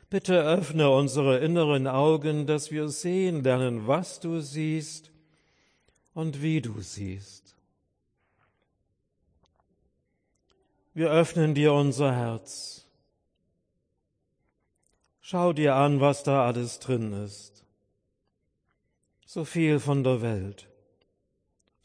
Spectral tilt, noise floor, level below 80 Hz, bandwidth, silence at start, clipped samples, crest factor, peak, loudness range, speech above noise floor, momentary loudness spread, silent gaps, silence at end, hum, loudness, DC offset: -6.5 dB/octave; -77 dBFS; -70 dBFS; 10.5 kHz; 0.1 s; under 0.1%; 18 dB; -10 dBFS; 11 LU; 52 dB; 15 LU; none; 1.25 s; none; -26 LUFS; under 0.1%